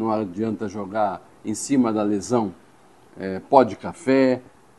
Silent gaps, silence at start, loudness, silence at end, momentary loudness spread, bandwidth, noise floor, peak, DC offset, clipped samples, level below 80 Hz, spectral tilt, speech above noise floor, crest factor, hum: none; 0 s; -22 LUFS; 0.4 s; 13 LU; 12.5 kHz; -53 dBFS; 0 dBFS; 0.1%; under 0.1%; -62 dBFS; -6 dB/octave; 31 dB; 22 dB; none